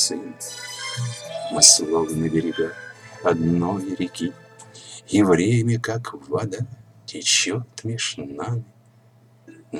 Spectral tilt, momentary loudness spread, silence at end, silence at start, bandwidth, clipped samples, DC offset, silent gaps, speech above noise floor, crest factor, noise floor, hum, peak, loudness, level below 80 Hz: -3 dB/octave; 16 LU; 0 s; 0 s; over 20 kHz; under 0.1%; under 0.1%; none; 32 dB; 22 dB; -54 dBFS; none; 0 dBFS; -21 LUFS; -56 dBFS